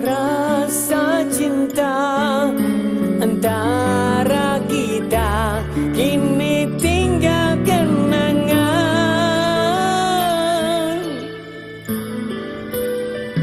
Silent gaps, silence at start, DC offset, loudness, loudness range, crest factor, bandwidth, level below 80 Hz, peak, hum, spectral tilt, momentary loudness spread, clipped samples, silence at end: none; 0 s; under 0.1%; -18 LUFS; 3 LU; 14 dB; 16 kHz; -38 dBFS; -4 dBFS; none; -5 dB/octave; 9 LU; under 0.1%; 0 s